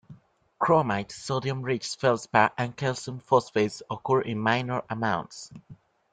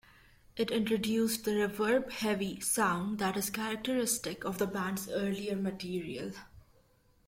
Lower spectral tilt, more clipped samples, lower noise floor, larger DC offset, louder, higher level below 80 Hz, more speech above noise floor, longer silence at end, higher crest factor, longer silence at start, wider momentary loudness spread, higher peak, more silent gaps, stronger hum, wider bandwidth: first, -5.5 dB/octave vs -4 dB/octave; neither; second, -52 dBFS vs -67 dBFS; neither; first, -27 LUFS vs -33 LUFS; about the same, -64 dBFS vs -64 dBFS; second, 26 dB vs 34 dB; second, 0.4 s vs 0.65 s; first, 22 dB vs 16 dB; second, 0.1 s vs 0.55 s; about the same, 9 LU vs 8 LU; first, -4 dBFS vs -18 dBFS; neither; neither; second, 9.4 kHz vs 16.5 kHz